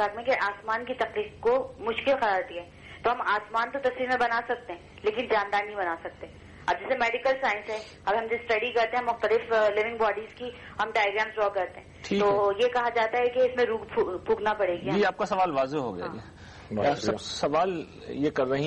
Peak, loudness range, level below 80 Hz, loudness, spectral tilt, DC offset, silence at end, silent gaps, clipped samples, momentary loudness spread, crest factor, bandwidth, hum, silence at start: -14 dBFS; 3 LU; -58 dBFS; -27 LUFS; -5 dB/octave; under 0.1%; 0 s; none; under 0.1%; 12 LU; 12 dB; 9.8 kHz; none; 0 s